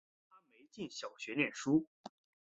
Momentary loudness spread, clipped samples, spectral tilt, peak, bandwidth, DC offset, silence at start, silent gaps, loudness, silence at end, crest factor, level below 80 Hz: 21 LU; under 0.1%; -4.5 dB/octave; -18 dBFS; 8 kHz; under 0.1%; 0.75 s; 1.87-2.04 s; -37 LUFS; 0.45 s; 22 dB; -80 dBFS